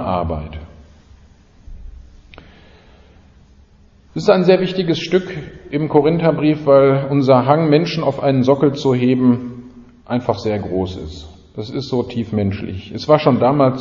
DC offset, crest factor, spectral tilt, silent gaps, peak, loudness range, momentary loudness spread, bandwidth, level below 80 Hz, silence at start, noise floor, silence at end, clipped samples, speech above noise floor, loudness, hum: under 0.1%; 18 dB; -8 dB/octave; none; 0 dBFS; 8 LU; 18 LU; 7.4 kHz; -42 dBFS; 0 s; -48 dBFS; 0 s; under 0.1%; 33 dB; -16 LUFS; none